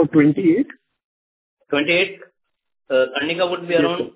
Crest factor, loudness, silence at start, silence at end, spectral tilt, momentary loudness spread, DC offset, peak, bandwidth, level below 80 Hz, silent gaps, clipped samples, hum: 18 dB; -19 LUFS; 0 s; 0.05 s; -10 dB/octave; 8 LU; under 0.1%; -2 dBFS; 4 kHz; -62 dBFS; 1.04-1.57 s; under 0.1%; none